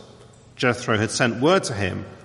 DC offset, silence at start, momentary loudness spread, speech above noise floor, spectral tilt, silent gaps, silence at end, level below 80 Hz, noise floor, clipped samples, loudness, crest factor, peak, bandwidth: under 0.1%; 0 s; 7 LU; 26 dB; -4.5 dB/octave; none; 0.05 s; -58 dBFS; -48 dBFS; under 0.1%; -22 LUFS; 18 dB; -4 dBFS; 11.5 kHz